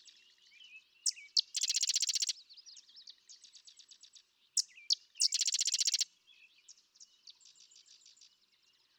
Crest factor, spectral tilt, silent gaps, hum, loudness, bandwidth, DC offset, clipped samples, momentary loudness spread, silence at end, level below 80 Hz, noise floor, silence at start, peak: 22 dB; 8 dB/octave; none; none; -32 LUFS; over 20 kHz; under 0.1%; under 0.1%; 25 LU; 1.95 s; under -90 dBFS; -72 dBFS; 0.05 s; -18 dBFS